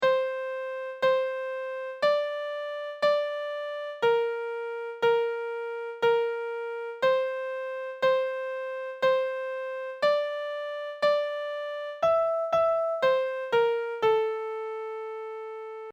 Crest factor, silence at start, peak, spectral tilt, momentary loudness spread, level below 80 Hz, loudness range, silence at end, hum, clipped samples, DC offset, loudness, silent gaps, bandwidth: 16 dB; 0 s; -12 dBFS; -3.5 dB/octave; 10 LU; -72 dBFS; 2 LU; 0 s; none; under 0.1%; under 0.1%; -28 LUFS; none; 9.2 kHz